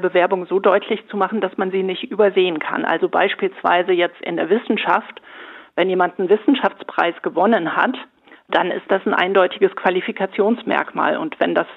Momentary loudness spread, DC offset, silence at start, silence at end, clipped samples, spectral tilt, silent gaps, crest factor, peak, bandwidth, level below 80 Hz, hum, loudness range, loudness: 6 LU; under 0.1%; 0 s; 0 s; under 0.1%; -7.5 dB/octave; none; 18 dB; -2 dBFS; 4.5 kHz; -72 dBFS; none; 1 LU; -19 LUFS